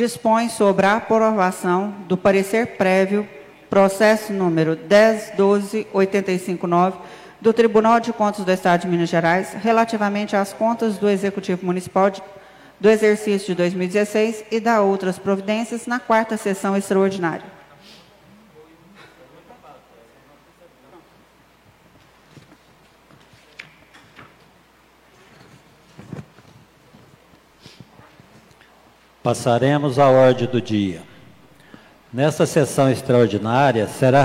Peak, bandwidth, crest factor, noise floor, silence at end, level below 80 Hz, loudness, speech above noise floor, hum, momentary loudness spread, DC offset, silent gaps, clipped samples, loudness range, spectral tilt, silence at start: -4 dBFS; 16 kHz; 16 dB; -53 dBFS; 0 s; -60 dBFS; -19 LUFS; 35 dB; none; 8 LU; under 0.1%; none; under 0.1%; 5 LU; -6 dB/octave; 0 s